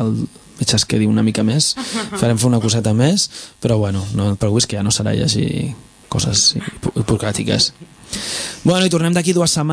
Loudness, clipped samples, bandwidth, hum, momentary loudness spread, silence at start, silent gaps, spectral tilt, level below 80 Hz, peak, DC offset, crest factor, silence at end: -17 LUFS; under 0.1%; 11 kHz; none; 9 LU; 0 s; none; -4.5 dB/octave; -42 dBFS; 0 dBFS; under 0.1%; 16 dB; 0 s